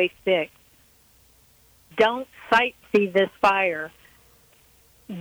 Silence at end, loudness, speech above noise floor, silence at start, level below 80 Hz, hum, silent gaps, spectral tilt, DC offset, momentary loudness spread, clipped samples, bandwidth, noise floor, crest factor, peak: 0 s; -22 LUFS; 35 dB; 0 s; -62 dBFS; none; none; -5 dB/octave; under 0.1%; 15 LU; under 0.1%; over 20 kHz; -58 dBFS; 18 dB; -6 dBFS